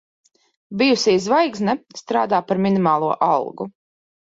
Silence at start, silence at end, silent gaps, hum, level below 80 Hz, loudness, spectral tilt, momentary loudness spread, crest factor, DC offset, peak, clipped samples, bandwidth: 0.7 s; 0.65 s; none; none; -64 dBFS; -19 LUFS; -5 dB/octave; 12 LU; 16 dB; under 0.1%; -4 dBFS; under 0.1%; 7.8 kHz